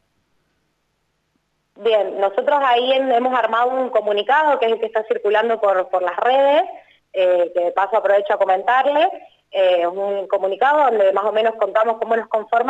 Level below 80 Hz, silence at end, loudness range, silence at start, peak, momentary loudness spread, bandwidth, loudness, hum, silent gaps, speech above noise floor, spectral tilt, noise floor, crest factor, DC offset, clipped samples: -72 dBFS; 0 s; 1 LU; 1.8 s; -6 dBFS; 6 LU; 7.8 kHz; -18 LUFS; 50 Hz at -75 dBFS; none; 52 dB; -4.5 dB/octave; -69 dBFS; 12 dB; under 0.1%; under 0.1%